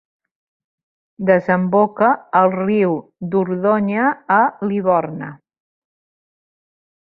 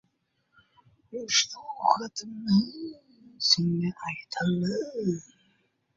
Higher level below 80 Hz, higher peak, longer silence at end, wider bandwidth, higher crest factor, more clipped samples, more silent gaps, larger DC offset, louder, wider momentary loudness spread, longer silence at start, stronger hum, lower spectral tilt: about the same, -64 dBFS vs -66 dBFS; first, -2 dBFS vs -6 dBFS; first, 1.7 s vs 0.75 s; second, 4.6 kHz vs 7.8 kHz; second, 18 dB vs 24 dB; neither; neither; neither; first, -17 LUFS vs -27 LUFS; second, 8 LU vs 14 LU; about the same, 1.2 s vs 1.1 s; neither; first, -10.5 dB/octave vs -4 dB/octave